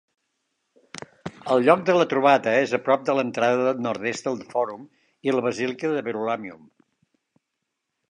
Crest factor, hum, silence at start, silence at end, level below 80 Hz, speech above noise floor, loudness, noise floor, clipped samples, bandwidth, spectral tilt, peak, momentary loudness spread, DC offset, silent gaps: 22 dB; none; 0.95 s; 1.55 s; -72 dBFS; 58 dB; -23 LUFS; -80 dBFS; under 0.1%; 10.5 kHz; -5.5 dB/octave; -2 dBFS; 19 LU; under 0.1%; none